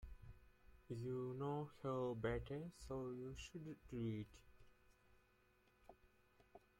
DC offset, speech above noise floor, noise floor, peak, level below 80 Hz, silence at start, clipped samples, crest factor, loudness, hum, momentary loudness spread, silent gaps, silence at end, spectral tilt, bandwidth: under 0.1%; 29 dB; -76 dBFS; -32 dBFS; -66 dBFS; 0 s; under 0.1%; 20 dB; -48 LUFS; none; 24 LU; none; 0.2 s; -7 dB/octave; 16.5 kHz